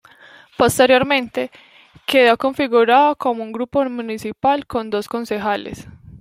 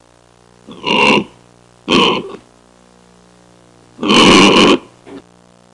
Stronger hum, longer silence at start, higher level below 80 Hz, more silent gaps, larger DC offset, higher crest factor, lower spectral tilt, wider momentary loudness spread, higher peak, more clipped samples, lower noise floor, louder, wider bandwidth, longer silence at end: second, none vs 60 Hz at -45 dBFS; about the same, 0.6 s vs 0.7 s; second, -52 dBFS vs -44 dBFS; neither; neither; about the same, 16 dB vs 14 dB; about the same, -4 dB/octave vs -3.5 dB/octave; second, 13 LU vs 21 LU; about the same, -2 dBFS vs 0 dBFS; neither; about the same, -46 dBFS vs -48 dBFS; second, -17 LUFS vs -10 LUFS; first, 16 kHz vs 11.5 kHz; second, 0.05 s vs 0.55 s